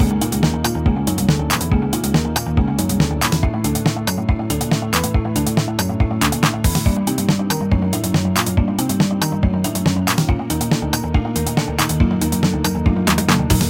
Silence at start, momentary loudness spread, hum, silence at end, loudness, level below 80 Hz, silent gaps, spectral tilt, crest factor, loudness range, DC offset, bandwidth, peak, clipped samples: 0 s; 3 LU; none; 0 s; -18 LUFS; -26 dBFS; none; -5 dB/octave; 16 dB; 1 LU; under 0.1%; 17 kHz; -2 dBFS; under 0.1%